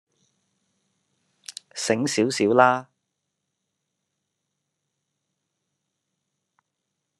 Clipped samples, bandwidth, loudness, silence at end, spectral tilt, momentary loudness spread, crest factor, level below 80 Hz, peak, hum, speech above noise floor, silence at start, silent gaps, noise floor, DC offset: under 0.1%; 12.5 kHz; -21 LUFS; 4.35 s; -4 dB/octave; 22 LU; 26 dB; -76 dBFS; -2 dBFS; none; 60 dB; 1.5 s; none; -81 dBFS; under 0.1%